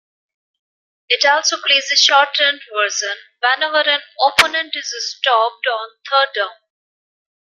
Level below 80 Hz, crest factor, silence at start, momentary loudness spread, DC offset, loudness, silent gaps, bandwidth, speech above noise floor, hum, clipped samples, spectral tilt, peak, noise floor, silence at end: -60 dBFS; 18 dB; 1.1 s; 11 LU; under 0.1%; -15 LUFS; none; 15.5 kHz; over 73 dB; none; under 0.1%; 1.5 dB/octave; 0 dBFS; under -90 dBFS; 1.05 s